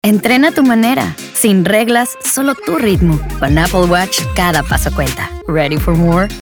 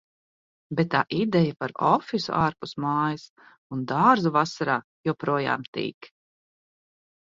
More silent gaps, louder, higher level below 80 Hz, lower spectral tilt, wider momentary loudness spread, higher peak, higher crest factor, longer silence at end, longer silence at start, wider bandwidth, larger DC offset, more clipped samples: second, none vs 3.29-3.36 s, 3.58-3.70 s, 4.84-5.04 s, 5.68-5.73 s, 5.94-6.01 s; first, -12 LUFS vs -25 LUFS; first, -24 dBFS vs -62 dBFS; second, -5 dB/octave vs -6.5 dB/octave; second, 6 LU vs 11 LU; first, 0 dBFS vs -6 dBFS; second, 12 dB vs 20 dB; second, 0.05 s vs 1.2 s; second, 0.05 s vs 0.7 s; first, over 20 kHz vs 7.6 kHz; neither; neither